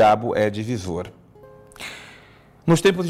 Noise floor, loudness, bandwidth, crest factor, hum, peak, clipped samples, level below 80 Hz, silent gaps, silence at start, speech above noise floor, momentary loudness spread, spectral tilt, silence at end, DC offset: -49 dBFS; -22 LUFS; 15.5 kHz; 14 dB; none; -8 dBFS; under 0.1%; -54 dBFS; none; 0 s; 30 dB; 20 LU; -5.5 dB/octave; 0 s; under 0.1%